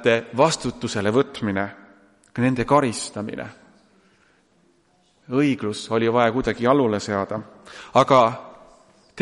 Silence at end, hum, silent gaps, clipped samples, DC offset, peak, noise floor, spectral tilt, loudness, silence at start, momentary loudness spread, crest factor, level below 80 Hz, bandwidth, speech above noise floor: 0 s; none; none; under 0.1%; under 0.1%; -2 dBFS; -62 dBFS; -5.5 dB/octave; -21 LUFS; 0 s; 15 LU; 20 dB; -52 dBFS; 11.5 kHz; 41 dB